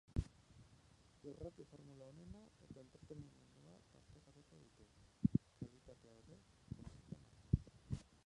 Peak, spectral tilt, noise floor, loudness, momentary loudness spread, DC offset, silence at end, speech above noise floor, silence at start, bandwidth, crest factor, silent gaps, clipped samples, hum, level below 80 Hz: -20 dBFS; -8.5 dB/octave; -69 dBFS; -48 LUFS; 24 LU; under 0.1%; 0.25 s; 11 dB; 0.1 s; 11 kHz; 28 dB; none; under 0.1%; none; -58 dBFS